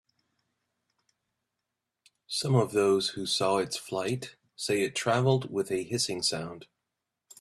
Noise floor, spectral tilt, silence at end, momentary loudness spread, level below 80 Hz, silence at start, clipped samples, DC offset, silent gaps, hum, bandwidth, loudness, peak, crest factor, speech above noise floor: -86 dBFS; -4.5 dB/octave; 0.75 s; 11 LU; -68 dBFS; 2.3 s; under 0.1%; under 0.1%; none; none; 13.5 kHz; -28 LUFS; -12 dBFS; 18 dB; 57 dB